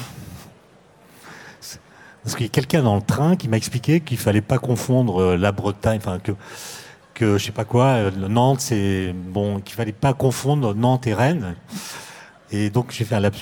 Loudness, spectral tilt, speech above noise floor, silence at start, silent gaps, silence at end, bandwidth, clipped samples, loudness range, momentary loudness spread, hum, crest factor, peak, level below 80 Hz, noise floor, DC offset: -21 LUFS; -6 dB/octave; 31 dB; 0 s; none; 0 s; 18 kHz; under 0.1%; 3 LU; 18 LU; none; 18 dB; -4 dBFS; -50 dBFS; -51 dBFS; under 0.1%